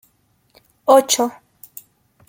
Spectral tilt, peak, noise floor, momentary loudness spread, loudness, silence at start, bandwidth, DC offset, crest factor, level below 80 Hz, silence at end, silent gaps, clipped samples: -1 dB/octave; -2 dBFS; -62 dBFS; 25 LU; -16 LUFS; 0.85 s; 17 kHz; under 0.1%; 20 dB; -68 dBFS; 1 s; none; under 0.1%